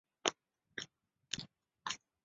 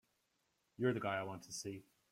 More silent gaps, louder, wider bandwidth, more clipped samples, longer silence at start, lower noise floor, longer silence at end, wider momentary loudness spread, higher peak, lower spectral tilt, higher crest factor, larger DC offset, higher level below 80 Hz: neither; about the same, -43 LUFS vs -41 LUFS; second, 8 kHz vs 16 kHz; neither; second, 0.25 s vs 0.8 s; second, -66 dBFS vs -82 dBFS; about the same, 0.3 s vs 0.3 s; about the same, 12 LU vs 11 LU; first, -12 dBFS vs -22 dBFS; second, -0.5 dB/octave vs -5 dB/octave; first, 34 dB vs 22 dB; neither; about the same, -78 dBFS vs -80 dBFS